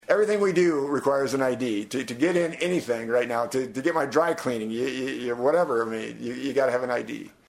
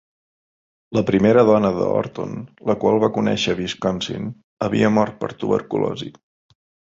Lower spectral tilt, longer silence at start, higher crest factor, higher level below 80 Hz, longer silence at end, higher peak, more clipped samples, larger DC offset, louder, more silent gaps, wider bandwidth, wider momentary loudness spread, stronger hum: second, -5 dB/octave vs -6.5 dB/octave; second, 0.1 s vs 0.9 s; about the same, 18 dB vs 18 dB; second, -68 dBFS vs -52 dBFS; second, 0.2 s vs 0.75 s; second, -6 dBFS vs -2 dBFS; neither; neither; second, -25 LUFS vs -20 LUFS; second, none vs 4.44-4.57 s; first, 15.5 kHz vs 7.8 kHz; second, 7 LU vs 14 LU; neither